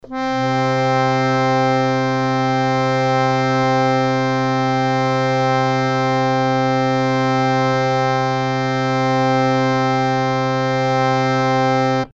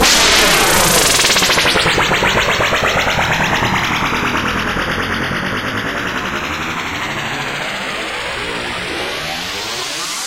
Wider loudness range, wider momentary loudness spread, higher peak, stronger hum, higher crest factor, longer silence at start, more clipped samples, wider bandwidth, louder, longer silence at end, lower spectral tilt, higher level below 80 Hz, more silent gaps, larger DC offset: second, 1 LU vs 9 LU; second, 2 LU vs 11 LU; second, -4 dBFS vs 0 dBFS; neither; about the same, 14 dB vs 16 dB; about the same, 0.05 s vs 0 s; neither; second, 7.8 kHz vs 17 kHz; second, -17 LUFS vs -14 LUFS; about the same, 0.05 s vs 0 s; first, -6.5 dB/octave vs -2 dB/octave; second, -48 dBFS vs -34 dBFS; neither; neither